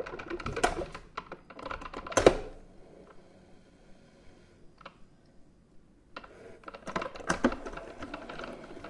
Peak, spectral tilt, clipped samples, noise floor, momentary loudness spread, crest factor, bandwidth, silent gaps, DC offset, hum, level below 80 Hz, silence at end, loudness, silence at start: -4 dBFS; -4 dB/octave; under 0.1%; -57 dBFS; 27 LU; 32 dB; 11.5 kHz; none; under 0.1%; none; -50 dBFS; 0 s; -33 LUFS; 0 s